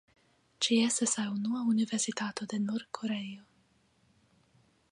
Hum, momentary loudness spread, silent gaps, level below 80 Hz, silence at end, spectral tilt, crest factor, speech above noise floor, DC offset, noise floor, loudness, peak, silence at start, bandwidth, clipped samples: none; 9 LU; none; -78 dBFS; 1.5 s; -3 dB/octave; 18 dB; 38 dB; under 0.1%; -69 dBFS; -31 LUFS; -16 dBFS; 0.6 s; 11.5 kHz; under 0.1%